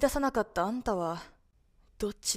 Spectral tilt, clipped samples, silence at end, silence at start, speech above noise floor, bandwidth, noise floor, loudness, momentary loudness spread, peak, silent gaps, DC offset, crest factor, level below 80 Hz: -3.5 dB/octave; under 0.1%; 0 s; 0 s; 35 dB; 16 kHz; -65 dBFS; -32 LUFS; 8 LU; -12 dBFS; none; under 0.1%; 20 dB; -48 dBFS